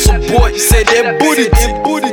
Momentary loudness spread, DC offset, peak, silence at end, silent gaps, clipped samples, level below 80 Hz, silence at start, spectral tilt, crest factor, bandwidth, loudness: 4 LU; under 0.1%; 0 dBFS; 0 s; none; under 0.1%; -14 dBFS; 0 s; -4 dB/octave; 10 dB; 19.5 kHz; -11 LUFS